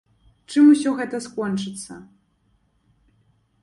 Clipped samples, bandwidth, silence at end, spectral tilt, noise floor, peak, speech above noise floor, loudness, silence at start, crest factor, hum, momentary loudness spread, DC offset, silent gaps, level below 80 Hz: under 0.1%; 11.5 kHz; 1.6 s; -5.5 dB/octave; -65 dBFS; -6 dBFS; 45 dB; -20 LUFS; 0.5 s; 18 dB; none; 22 LU; under 0.1%; none; -64 dBFS